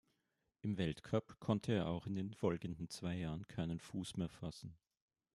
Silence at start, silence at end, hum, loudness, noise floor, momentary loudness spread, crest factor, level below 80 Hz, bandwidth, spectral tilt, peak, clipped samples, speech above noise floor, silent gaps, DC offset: 0.65 s; 0.6 s; none; -42 LUFS; -86 dBFS; 9 LU; 22 dB; -68 dBFS; 12.5 kHz; -6.5 dB/octave; -22 dBFS; under 0.1%; 44 dB; none; under 0.1%